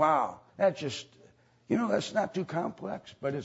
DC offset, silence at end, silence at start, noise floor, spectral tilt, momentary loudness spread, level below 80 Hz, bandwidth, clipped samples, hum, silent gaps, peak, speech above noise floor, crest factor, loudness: under 0.1%; 0 s; 0 s; -61 dBFS; -5.5 dB/octave; 11 LU; -70 dBFS; 8 kHz; under 0.1%; none; none; -12 dBFS; 31 dB; 18 dB; -32 LUFS